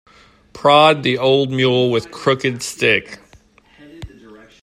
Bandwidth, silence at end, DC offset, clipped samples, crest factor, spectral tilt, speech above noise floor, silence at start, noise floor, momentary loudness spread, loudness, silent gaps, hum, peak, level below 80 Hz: 13.5 kHz; 0.55 s; under 0.1%; under 0.1%; 18 dB; -4.5 dB/octave; 34 dB; 0.55 s; -50 dBFS; 8 LU; -15 LUFS; none; none; 0 dBFS; -52 dBFS